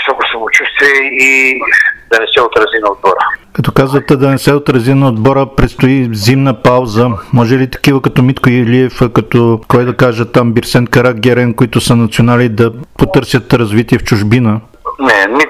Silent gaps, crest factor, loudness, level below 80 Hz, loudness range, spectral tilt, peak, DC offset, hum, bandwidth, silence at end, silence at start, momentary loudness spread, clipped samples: none; 10 dB; -9 LUFS; -32 dBFS; 2 LU; -6 dB/octave; 0 dBFS; under 0.1%; none; 15.5 kHz; 0 s; 0 s; 5 LU; 0.4%